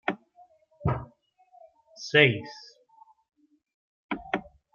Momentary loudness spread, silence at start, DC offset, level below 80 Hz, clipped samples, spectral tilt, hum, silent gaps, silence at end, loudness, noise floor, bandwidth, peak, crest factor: 23 LU; 0.05 s; under 0.1%; -56 dBFS; under 0.1%; -5.5 dB/octave; none; 3.74-4.09 s; 0.35 s; -26 LUFS; -59 dBFS; 7.2 kHz; -6 dBFS; 26 dB